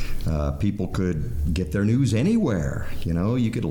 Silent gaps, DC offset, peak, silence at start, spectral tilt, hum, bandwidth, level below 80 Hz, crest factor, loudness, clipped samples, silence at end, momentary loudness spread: none; under 0.1%; -12 dBFS; 0 s; -7.5 dB/octave; none; 19 kHz; -32 dBFS; 12 dB; -24 LUFS; under 0.1%; 0 s; 7 LU